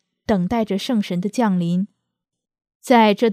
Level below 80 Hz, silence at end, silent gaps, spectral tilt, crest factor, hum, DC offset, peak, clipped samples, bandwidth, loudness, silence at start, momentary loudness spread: -52 dBFS; 0 s; 2.75-2.80 s; -6.5 dB/octave; 20 dB; none; under 0.1%; 0 dBFS; under 0.1%; 15 kHz; -19 LUFS; 0.3 s; 8 LU